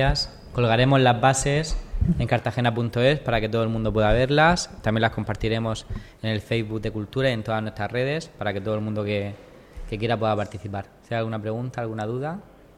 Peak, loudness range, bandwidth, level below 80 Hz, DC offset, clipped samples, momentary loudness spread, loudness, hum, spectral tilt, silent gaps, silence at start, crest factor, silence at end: -4 dBFS; 7 LU; 12.5 kHz; -36 dBFS; under 0.1%; under 0.1%; 13 LU; -24 LUFS; none; -5.5 dB/octave; none; 0 s; 20 dB; 0.35 s